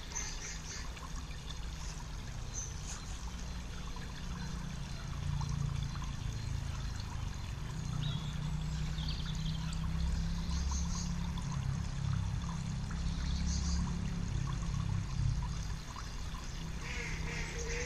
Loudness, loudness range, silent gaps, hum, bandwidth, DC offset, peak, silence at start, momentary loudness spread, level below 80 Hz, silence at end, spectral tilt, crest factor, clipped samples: -39 LUFS; 6 LU; none; none; 13.5 kHz; under 0.1%; -22 dBFS; 0 s; 8 LU; -40 dBFS; 0 s; -4.5 dB/octave; 16 dB; under 0.1%